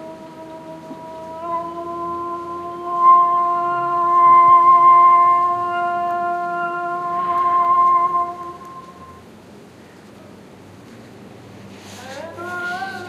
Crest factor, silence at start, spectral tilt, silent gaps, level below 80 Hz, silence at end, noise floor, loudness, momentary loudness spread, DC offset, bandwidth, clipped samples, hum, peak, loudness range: 16 dB; 0 s; -5.5 dB/octave; none; -62 dBFS; 0 s; -42 dBFS; -16 LUFS; 25 LU; under 0.1%; 9 kHz; under 0.1%; none; -2 dBFS; 15 LU